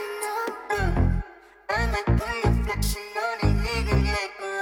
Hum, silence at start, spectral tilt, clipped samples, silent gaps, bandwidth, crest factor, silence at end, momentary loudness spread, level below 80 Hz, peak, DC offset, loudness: none; 0 s; -5.5 dB/octave; under 0.1%; none; 18 kHz; 14 dB; 0 s; 6 LU; -30 dBFS; -10 dBFS; under 0.1%; -26 LUFS